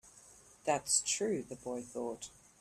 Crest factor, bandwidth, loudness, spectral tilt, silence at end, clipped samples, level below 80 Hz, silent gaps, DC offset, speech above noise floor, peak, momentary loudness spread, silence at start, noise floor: 22 dB; 15 kHz; -35 LUFS; -2 dB/octave; 0.3 s; under 0.1%; -72 dBFS; none; under 0.1%; 24 dB; -16 dBFS; 13 LU; 0.05 s; -60 dBFS